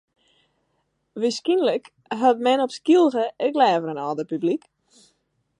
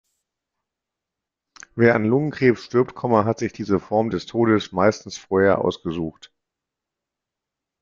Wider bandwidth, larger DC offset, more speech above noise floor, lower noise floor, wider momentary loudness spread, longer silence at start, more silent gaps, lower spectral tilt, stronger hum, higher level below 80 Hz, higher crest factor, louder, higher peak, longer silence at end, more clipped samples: first, 10.5 kHz vs 7.4 kHz; neither; second, 51 dB vs 65 dB; second, -72 dBFS vs -86 dBFS; about the same, 11 LU vs 10 LU; second, 1.15 s vs 1.75 s; neither; second, -5 dB/octave vs -6.5 dB/octave; neither; second, -78 dBFS vs -58 dBFS; about the same, 18 dB vs 20 dB; about the same, -22 LUFS vs -21 LUFS; about the same, -4 dBFS vs -2 dBFS; second, 1 s vs 1.7 s; neither